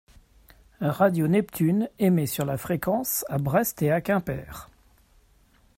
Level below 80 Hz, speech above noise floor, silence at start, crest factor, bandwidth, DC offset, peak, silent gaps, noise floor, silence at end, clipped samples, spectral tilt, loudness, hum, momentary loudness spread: -54 dBFS; 36 dB; 0.8 s; 18 dB; 16.5 kHz; under 0.1%; -8 dBFS; none; -60 dBFS; 1.1 s; under 0.1%; -6 dB/octave; -25 LUFS; none; 8 LU